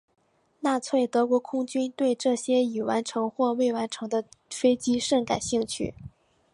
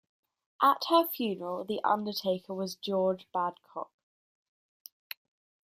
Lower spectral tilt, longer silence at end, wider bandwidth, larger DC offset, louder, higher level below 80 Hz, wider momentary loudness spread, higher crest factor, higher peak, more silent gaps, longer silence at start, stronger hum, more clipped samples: about the same, -4 dB/octave vs -5 dB/octave; second, 0.45 s vs 1.9 s; second, 11.5 kHz vs 15.5 kHz; neither; first, -26 LUFS vs -30 LUFS; first, -60 dBFS vs -80 dBFS; second, 7 LU vs 19 LU; about the same, 16 dB vs 20 dB; about the same, -10 dBFS vs -12 dBFS; neither; about the same, 0.6 s vs 0.6 s; neither; neither